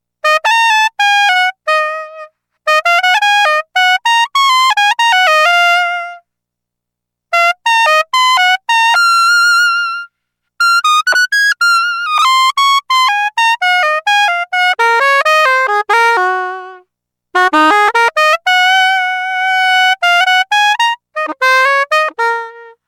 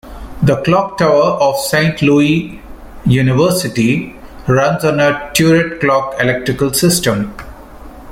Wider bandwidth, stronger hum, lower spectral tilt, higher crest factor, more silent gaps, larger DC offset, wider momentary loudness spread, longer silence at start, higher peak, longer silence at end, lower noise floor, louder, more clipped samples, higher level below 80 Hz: about the same, 17.5 kHz vs 16.5 kHz; first, 60 Hz at -80 dBFS vs none; second, 2 dB/octave vs -5 dB/octave; about the same, 10 dB vs 14 dB; neither; neither; about the same, 7 LU vs 9 LU; first, 0.25 s vs 0.05 s; about the same, -2 dBFS vs 0 dBFS; first, 0.2 s vs 0 s; first, -78 dBFS vs -33 dBFS; first, -10 LUFS vs -13 LUFS; neither; second, -68 dBFS vs -36 dBFS